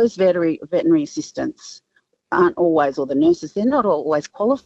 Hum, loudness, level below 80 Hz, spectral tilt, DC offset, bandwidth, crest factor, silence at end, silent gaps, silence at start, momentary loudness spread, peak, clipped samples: none; -19 LUFS; -60 dBFS; -6 dB/octave; under 0.1%; 8 kHz; 14 dB; 0.1 s; none; 0 s; 10 LU; -4 dBFS; under 0.1%